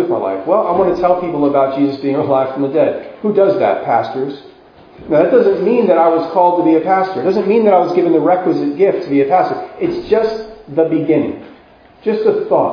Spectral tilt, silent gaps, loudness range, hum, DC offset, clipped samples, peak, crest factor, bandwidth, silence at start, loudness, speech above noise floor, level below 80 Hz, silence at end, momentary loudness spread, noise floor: -8.5 dB/octave; none; 4 LU; none; under 0.1%; under 0.1%; 0 dBFS; 14 dB; 5.4 kHz; 0 s; -14 LUFS; 30 dB; -52 dBFS; 0 s; 9 LU; -43 dBFS